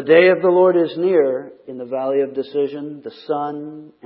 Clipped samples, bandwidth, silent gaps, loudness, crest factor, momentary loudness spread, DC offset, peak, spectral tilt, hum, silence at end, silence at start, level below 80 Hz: under 0.1%; 5.4 kHz; none; -18 LUFS; 16 dB; 19 LU; under 0.1%; 0 dBFS; -11 dB/octave; none; 0.2 s; 0 s; -74 dBFS